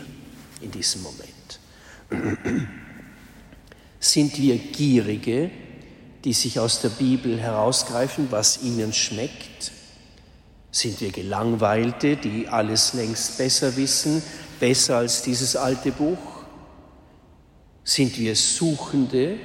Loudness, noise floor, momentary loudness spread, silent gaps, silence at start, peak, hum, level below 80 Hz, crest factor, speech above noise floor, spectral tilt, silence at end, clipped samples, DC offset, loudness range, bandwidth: -22 LUFS; -52 dBFS; 18 LU; none; 0 s; -4 dBFS; none; -54 dBFS; 20 dB; 30 dB; -3.5 dB/octave; 0 s; under 0.1%; under 0.1%; 5 LU; 16 kHz